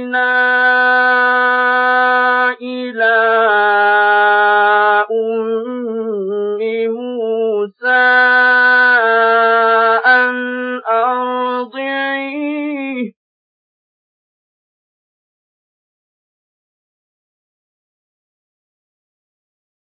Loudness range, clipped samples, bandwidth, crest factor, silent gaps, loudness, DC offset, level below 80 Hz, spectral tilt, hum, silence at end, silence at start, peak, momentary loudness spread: 12 LU; under 0.1%; 5 kHz; 14 dB; none; -13 LUFS; under 0.1%; -90 dBFS; -8.5 dB/octave; none; 6.75 s; 0 s; 0 dBFS; 11 LU